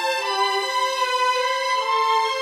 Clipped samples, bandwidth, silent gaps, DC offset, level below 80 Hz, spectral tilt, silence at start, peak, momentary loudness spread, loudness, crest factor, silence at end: under 0.1%; 16 kHz; none; under 0.1%; -74 dBFS; 1.5 dB/octave; 0 s; -10 dBFS; 2 LU; -21 LUFS; 12 dB; 0 s